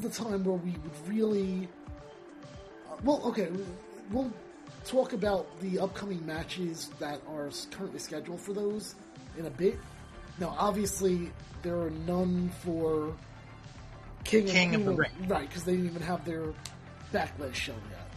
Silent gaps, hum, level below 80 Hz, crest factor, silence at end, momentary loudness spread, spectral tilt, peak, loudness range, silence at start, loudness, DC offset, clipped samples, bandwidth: none; none; -54 dBFS; 24 dB; 0 s; 19 LU; -5.5 dB/octave; -10 dBFS; 7 LU; 0 s; -32 LUFS; under 0.1%; under 0.1%; 13.5 kHz